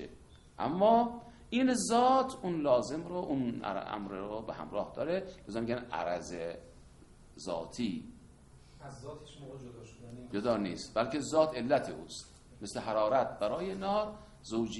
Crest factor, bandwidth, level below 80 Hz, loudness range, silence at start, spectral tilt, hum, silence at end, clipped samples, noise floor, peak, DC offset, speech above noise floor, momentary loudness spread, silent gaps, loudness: 20 dB; 11.5 kHz; -60 dBFS; 12 LU; 0 s; -5 dB/octave; none; 0 s; under 0.1%; -57 dBFS; -14 dBFS; under 0.1%; 24 dB; 20 LU; none; -33 LUFS